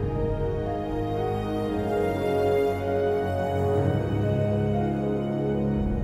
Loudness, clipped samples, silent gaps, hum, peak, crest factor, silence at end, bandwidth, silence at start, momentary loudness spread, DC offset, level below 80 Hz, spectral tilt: -26 LUFS; under 0.1%; none; none; -12 dBFS; 12 dB; 0 s; 14.5 kHz; 0 s; 4 LU; under 0.1%; -40 dBFS; -8.5 dB/octave